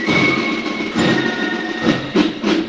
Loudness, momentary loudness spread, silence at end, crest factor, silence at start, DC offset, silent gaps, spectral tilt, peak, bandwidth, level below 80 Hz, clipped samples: -17 LUFS; 6 LU; 0 s; 16 dB; 0 s; under 0.1%; none; -5 dB/octave; -2 dBFS; 9.4 kHz; -48 dBFS; under 0.1%